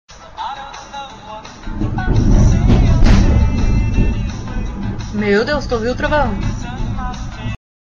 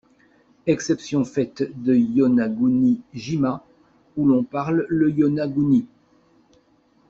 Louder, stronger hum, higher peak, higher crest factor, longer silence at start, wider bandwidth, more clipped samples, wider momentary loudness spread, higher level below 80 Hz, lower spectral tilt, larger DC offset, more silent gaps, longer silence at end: first, -17 LUFS vs -21 LUFS; neither; first, -2 dBFS vs -6 dBFS; about the same, 12 dB vs 16 dB; second, 0.1 s vs 0.65 s; about the same, 7.4 kHz vs 7.6 kHz; neither; first, 17 LU vs 8 LU; first, -18 dBFS vs -58 dBFS; about the same, -7 dB/octave vs -7 dB/octave; neither; neither; second, 0.4 s vs 1.25 s